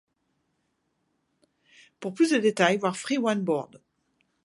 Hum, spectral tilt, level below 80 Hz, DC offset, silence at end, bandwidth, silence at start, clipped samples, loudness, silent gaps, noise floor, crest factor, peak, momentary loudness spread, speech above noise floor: none; -4.5 dB/octave; -78 dBFS; under 0.1%; 0.7 s; 11.5 kHz; 2 s; under 0.1%; -25 LUFS; none; -75 dBFS; 24 dB; -4 dBFS; 15 LU; 50 dB